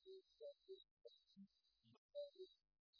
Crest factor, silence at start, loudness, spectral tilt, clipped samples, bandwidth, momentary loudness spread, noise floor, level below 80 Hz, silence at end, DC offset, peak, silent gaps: 18 dB; 0 s; -62 LUFS; -5.5 dB/octave; under 0.1%; 5.4 kHz; 12 LU; -79 dBFS; under -90 dBFS; 0 s; under 0.1%; -44 dBFS; 0.91-0.97 s, 1.98-2.09 s, 2.79-2.93 s